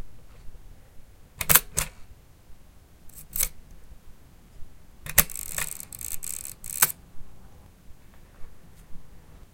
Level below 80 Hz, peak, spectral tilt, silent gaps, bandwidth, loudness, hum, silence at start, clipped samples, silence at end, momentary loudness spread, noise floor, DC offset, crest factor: -46 dBFS; 0 dBFS; -1 dB/octave; none; 17 kHz; -25 LUFS; none; 0 s; under 0.1%; 0.15 s; 18 LU; -51 dBFS; under 0.1%; 32 dB